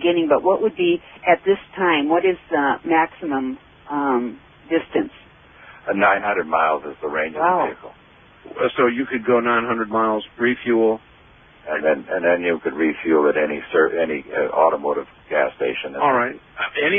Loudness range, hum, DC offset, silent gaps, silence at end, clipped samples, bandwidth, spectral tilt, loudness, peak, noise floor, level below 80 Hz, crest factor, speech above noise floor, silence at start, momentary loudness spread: 3 LU; none; under 0.1%; none; 0 s; under 0.1%; 3.7 kHz; -3 dB/octave; -20 LUFS; -2 dBFS; -49 dBFS; -58 dBFS; 18 dB; 30 dB; 0 s; 9 LU